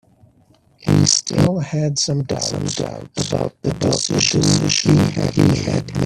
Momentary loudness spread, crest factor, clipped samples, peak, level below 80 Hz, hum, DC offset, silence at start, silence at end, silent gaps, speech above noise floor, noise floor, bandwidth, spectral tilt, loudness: 9 LU; 18 dB; under 0.1%; 0 dBFS; -44 dBFS; none; under 0.1%; 0.8 s; 0 s; none; 37 dB; -54 dBFS; 13 kHz; -4.5 dB/octave; -17 LUFS